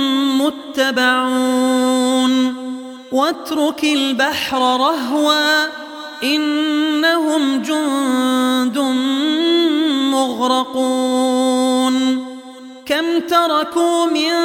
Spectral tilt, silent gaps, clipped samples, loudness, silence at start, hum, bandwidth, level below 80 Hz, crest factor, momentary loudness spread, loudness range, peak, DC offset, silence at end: -2 dB/octave; none; under 0.1%; -16 LUFS; 0 s; none; 17 kHz; -64 dBFS; 16 dB; 6 LU; 1 LU; 0 dBFS; under 0.1%; 0 s